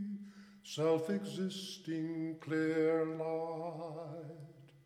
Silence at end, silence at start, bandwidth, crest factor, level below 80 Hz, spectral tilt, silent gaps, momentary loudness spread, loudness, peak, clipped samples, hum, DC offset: 0.1 s; 0 s; 14.5 kHz; 16 dB; -84 dBFS; -6 dB/octave; none; 18 LU; -37 LUFS; -22 dBFS; under 0.1%; none; under 0.1%